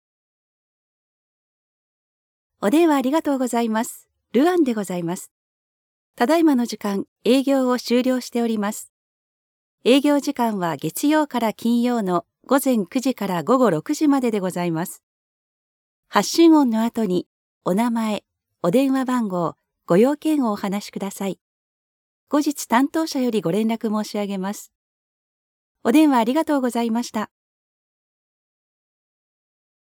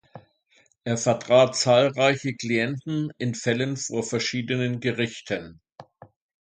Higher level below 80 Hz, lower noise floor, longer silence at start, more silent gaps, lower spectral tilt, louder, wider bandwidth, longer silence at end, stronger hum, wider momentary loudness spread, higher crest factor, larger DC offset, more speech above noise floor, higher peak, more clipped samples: second, -74 dBFS vs -64 dBFS; first, under -90 dBFS vs -63 dBFS; first, 2.6 s vs 0.15 s; first, 5.31-6.14 s, 7.08-7.16 s, 8.89-9.78 s, 15.03-16.03 s, 17.26-17.61 s, 21.41-22.27 s, 24.75-25.75 s vs 5.72-5.76 s; about the same, -5 dB/octave vs -4.5 dB/octave; first, -21 LUFS vs -24 LUFS; first, 19 kHz vs 9.6 kHz; first, 2.65 s vs 0.6 s; neither; about the same, 11 LU vs 11 LU; about the same, 20 dB vs 20 dB; neither; first, over 70 dB vs 39 dB; first, -2 dBFS vs -6 dBFS; neither